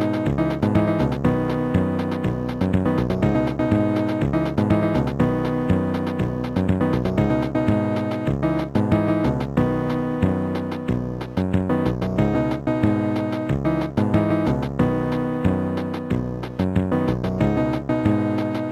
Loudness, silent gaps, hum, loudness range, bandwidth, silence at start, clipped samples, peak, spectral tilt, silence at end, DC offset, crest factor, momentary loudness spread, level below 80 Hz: -22 LUFS; none; none; 2 LU; 12.5 kHz; 0 s; under 0.1%; -6 dBFS; -9 dB/octave; 0 s; under 0.1%; 14 dB; 4 LU; -38 dBFS